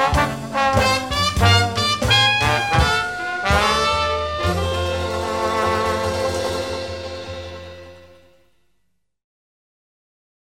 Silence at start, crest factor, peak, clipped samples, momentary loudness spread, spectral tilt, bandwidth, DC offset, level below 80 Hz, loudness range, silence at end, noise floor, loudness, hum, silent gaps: 0 s; 18 dB; -2 dBFS; under 0.1%; 14 LU; -4 dB/octave; 16.5 kHz; 0.3%; -34 dBFS; 15 LU; 2.5 s; -70 dBFS; -19 LUFS; none; none